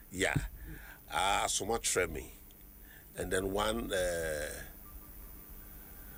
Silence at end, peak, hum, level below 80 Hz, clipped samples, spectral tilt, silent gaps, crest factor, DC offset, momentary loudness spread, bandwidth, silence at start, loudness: 0 s; -18 dBFS; none; -50 dBFS; under 0.1%; -3 dB/octave; none; 20 dB; under 0.1%; 19 LU; over 20 kHz; 0 s; -34 LUFS